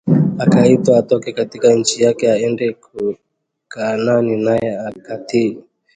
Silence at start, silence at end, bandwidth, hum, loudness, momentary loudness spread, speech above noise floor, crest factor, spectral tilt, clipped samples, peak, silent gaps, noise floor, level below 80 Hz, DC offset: 0.05 s; 0.35 s; 9.6 kHz; none; -16 LUFS; 14 LU; 26 dB; 16 dB; -6 dB/octave; under 0.1%; 0 dBFS; none; -41 dBFS; -54 dBFS; under 0.1%